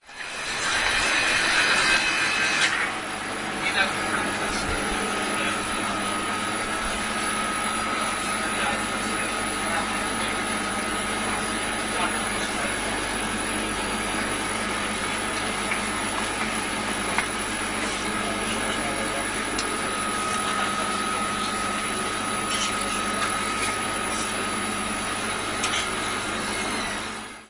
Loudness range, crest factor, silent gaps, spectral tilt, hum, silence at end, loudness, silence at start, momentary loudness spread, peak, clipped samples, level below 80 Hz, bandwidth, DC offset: 4 LU; 20 dB; none; -2 dB/octave; none; 0 s; -24 LUFS; 0.05 s; 6 LU; -6 dBFS; under 0.1%; -46 dBFS; 11 kHz; under 0.1%